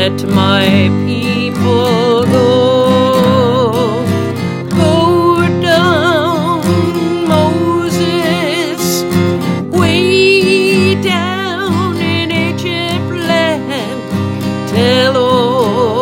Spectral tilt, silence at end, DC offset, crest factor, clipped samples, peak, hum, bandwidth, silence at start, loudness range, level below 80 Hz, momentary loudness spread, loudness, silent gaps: -5.5 dB/octave; 0 s; under 0.1%; 12 dB; under 0.1%; 0 dBFS; none; 17 kHz; 0 s; 3 LU; -48 dBFS; 7 LU; -12 LUFS; none